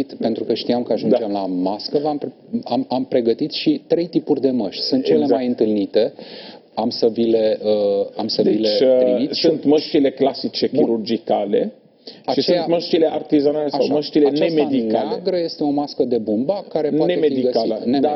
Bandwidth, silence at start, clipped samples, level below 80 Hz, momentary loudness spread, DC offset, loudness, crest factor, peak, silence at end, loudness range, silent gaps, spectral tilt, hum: 6 kHz; 0 s; under 0.1%; -64 dBFS; 6 LU; under 0.1%; -19 LUFS; 14 dB; -6 dBFS; 0 s; 3 LU; none; -7 dB/octave; none